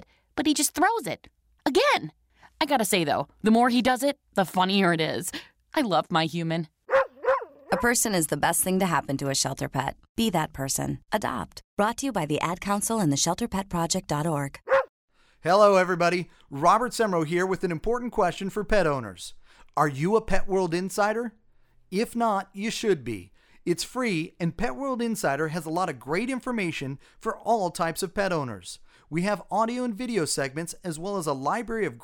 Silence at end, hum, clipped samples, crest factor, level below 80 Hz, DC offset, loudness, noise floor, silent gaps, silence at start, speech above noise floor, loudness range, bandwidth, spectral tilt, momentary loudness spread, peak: 0 s; none; under 0.1%; 20 dB; -46 dBFS; under 0.1%; -26 LUFS; -58 dBFS; 10.09-10.15 s, 11.64-11.77 s, 14.89-15.08 s; 0 s; 33 dB; 5 LU; 19 kHz; -4 dB/octave; 11 LU; -6 dBFS